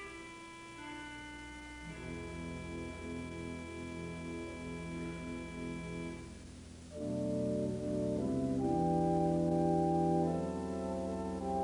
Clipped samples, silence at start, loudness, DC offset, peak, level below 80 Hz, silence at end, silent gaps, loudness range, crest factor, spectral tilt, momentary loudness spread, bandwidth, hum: under 0.1%; 0 s; -37 LUFS; under 0.1%; -20 dBFS; -56 dBFS; 0 s; none; 11 LU; 16 dB; -7 dB/octave; 16 LU; 11 kHz; none